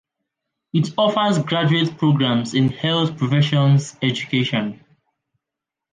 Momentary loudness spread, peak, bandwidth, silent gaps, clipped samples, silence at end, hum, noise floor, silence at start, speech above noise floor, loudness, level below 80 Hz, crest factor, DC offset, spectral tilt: 6 LU; -6 dBFS; 9.4 kHz; none; under 0.1%; 1.15 s; none; -85 dBFS; 0.75 s; 67 dB; -19 LUFS; -58 dBFS; 14 dB; under 0.1%; -6.5 dB/octave